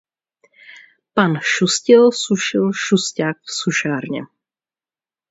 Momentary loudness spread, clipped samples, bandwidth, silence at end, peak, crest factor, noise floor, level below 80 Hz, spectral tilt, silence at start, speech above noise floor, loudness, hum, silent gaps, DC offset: 11 LU; under 0.1%; 8 kHz; 1.05 s; 0 dBFS; 18 dB; under -90 dBFS; -64 dBFS; -4 dB/octave; 0.7 s; over 73 dB; -17 LUFS; none; none; under 0.1%